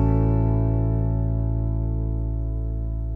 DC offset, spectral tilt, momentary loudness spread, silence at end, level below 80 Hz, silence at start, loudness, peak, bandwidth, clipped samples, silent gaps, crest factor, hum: under 0.1%; -13 dB/octave; 7 LU; 0 s; -26 dBFS; 0 s; -24 LUFS; -10 dBFS; 2.8 kHz; under 0.1%; none; 12 dB; none